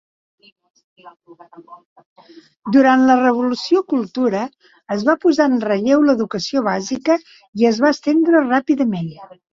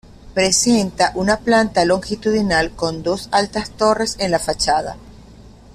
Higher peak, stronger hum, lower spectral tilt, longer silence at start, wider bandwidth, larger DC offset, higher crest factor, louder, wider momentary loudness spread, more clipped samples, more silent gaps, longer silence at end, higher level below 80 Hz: about the same, -2 dBFS vs -2 dBFS; neither; first, -5.5 dB/octave vs -3.5 dB/octave; first, 1.05 s vs 0.25 s; second, 7.6 kHz vs 15 kHz; neither; about the same, 16 dB vs 16 dB; about the same, -16 LUFS vs -17 LUFS; about the same, 10 LU vs 8 LU; neither; first, 1.85-1.96 s, 2.06-2.16 s, 7.48-7.53 s vs none; about the same, 0.3 s vs 0.25 s; second, -62 dBFS vs -40 dBFS